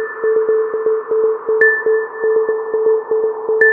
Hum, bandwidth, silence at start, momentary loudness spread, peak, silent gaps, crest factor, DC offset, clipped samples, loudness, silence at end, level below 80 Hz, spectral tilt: none; 2.4 kHz; 0 s; 6 LU; 0 dBFS; none; 16 dB; under 0.1%; under 0.1%; -16 LUFS; 0 s; -66 dBFS; -6.5 dB/octave